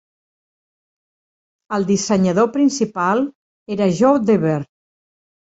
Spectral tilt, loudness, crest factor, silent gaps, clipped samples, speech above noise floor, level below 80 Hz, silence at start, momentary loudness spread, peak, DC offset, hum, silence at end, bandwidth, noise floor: -6 dB/octave; -18 LUFS; 18 dB; 3.35-3.66 s; under 0.1%; over 74 dB; -60 dBFS; 1.7 s; 10 LU; -2 dBFS; under 0.1%; none; 0.85 s; 8 kHz; under -90 dBFS